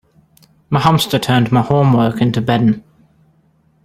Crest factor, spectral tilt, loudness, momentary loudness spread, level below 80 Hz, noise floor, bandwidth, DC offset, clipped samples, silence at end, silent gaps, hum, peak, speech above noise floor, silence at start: 16 dB; -6.5 dB/octave; -14 LUFS; 4 LU; -46 dBFS; -55 dBFS; 16 kHz; under 0.1%; under 0.1%; 1.05 s; none; none; 0 dBFS; 42 dB; 0.7 s